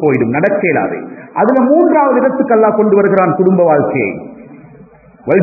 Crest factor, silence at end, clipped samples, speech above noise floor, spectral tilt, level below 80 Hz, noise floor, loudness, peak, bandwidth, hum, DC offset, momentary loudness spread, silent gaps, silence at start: 12 dB; 0 s; under 0.1%; 29 dB; -12 dB/octave; -54 dBFS; -40 dBFS; -11 LUFS; 0 dBFS; 2.7 kHz; none; under 0.1%; 12 LU; none; 0 s